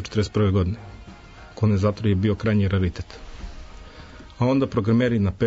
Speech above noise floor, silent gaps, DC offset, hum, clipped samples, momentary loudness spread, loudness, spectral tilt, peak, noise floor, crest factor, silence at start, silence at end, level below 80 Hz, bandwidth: 22 dB; none; under 0.1%; none; under 0.1%; 23 LU; -22 LUFS; -8 dB/octave; -8 dBFS; -43 dBFS; 14 dB; 0 s; 0 s; -42 dBFS; 7.8 kHz